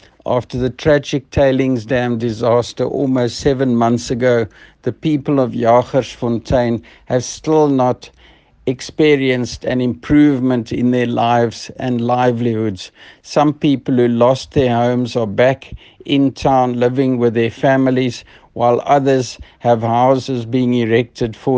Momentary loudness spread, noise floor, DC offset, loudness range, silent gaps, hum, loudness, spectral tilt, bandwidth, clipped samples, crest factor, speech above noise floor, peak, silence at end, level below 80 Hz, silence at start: 8 LU; -47 dBFS; under 0.1%; 2 LU; none; none; -16 LUFS; -6.5 dB/octave; 9.2 kHz; under 0.1%; 16 dB; 32 dB; 0 dBFS; 0 s; -42 dBFS; 0.25 s